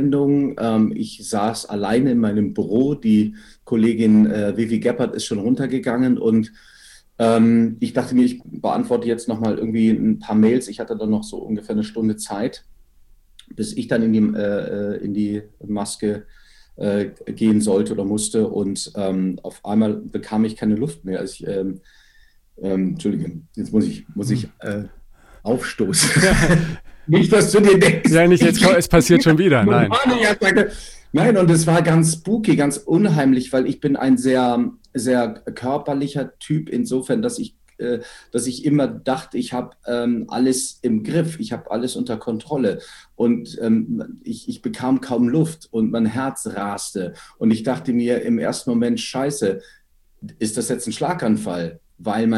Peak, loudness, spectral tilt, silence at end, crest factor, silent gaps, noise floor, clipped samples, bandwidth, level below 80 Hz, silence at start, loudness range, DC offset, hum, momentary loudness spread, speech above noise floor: 0 dBFS; -19 LUFS; -5.5 dB/octave; 0 s; 18 dB; none; -52 dBFS; under 0.1%; 14 kHz; -42 dBFS; 0 s; 9 LU; under 0.1%; none; 13 LU; 33 dB